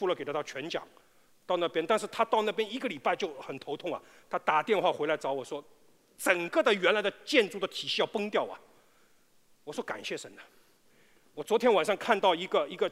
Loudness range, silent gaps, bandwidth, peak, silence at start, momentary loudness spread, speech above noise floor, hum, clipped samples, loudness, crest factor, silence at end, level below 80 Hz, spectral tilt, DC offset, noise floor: 7 LU; none; 16 kHz; -8 dBFS; 0 s; 14 LU; 33 dB; none; under 0.1%; -30 LUFS; 24 dB; 0 s; -80 dBFS; -3.5 dB/octave; under 0.1%; -63 dBFS